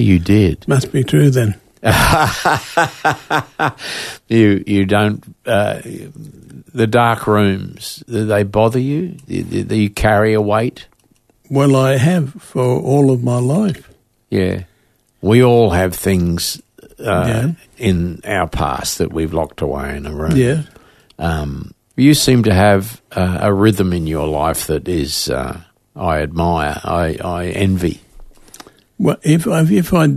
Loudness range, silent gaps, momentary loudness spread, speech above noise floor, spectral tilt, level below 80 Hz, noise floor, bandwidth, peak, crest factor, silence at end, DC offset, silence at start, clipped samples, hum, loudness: 4 LU; none; 11 LU; 43 dB; -6 dB/octave; -34 dBFS; -58 dBFS; 14 kHz; 0 dBFS; 16 dB; 0 s; under 0.1%; 0 s; under 0.1%; none; -15 LUFS